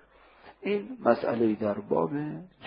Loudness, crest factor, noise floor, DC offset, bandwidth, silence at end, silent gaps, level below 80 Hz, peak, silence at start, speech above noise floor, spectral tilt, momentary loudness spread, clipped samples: -29 LUFS; 22 dB; -55 dBFS; under 0.1%; 5.4 kHz; 0 s; none; -68 dBFS; -6 dBFS; 0.45 s; 27 dB; -11 dB/octave; 9 LU; under 0.1%